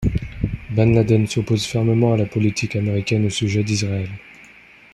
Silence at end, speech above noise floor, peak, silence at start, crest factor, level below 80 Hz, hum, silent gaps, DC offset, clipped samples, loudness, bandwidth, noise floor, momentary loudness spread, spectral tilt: 0.5 s; 28 dB; -2 dBFS; 0 s; 16 dB; -38 dBFS; none; none; under 0.1%; under 0.1%; -20 LUFS; 12 kHz; -46 dBFS; 10 LU; -6 dB/octave